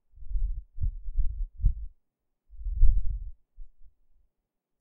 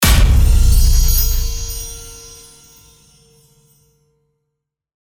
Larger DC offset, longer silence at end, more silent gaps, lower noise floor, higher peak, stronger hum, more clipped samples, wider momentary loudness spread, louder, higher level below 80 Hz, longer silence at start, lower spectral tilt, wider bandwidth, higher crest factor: neither; second, 0.95 s vs 2.9 s; neither; first, -82 dBFS vs -77 dBFS; second, -6 dBFS vs 0 dBFS; neither; neither; second, 14 LU vs 22 LU; second, -34 LUFS vs -15 LUFS; second, -30 dBFS vs -16 dBFS; first, 0.2 s vs 0 s; first, -19 dB/octave vs -3.5 dB/octave; second, 0.3 kHz vs over 20 kHz; first, 20 dB vs 14 dB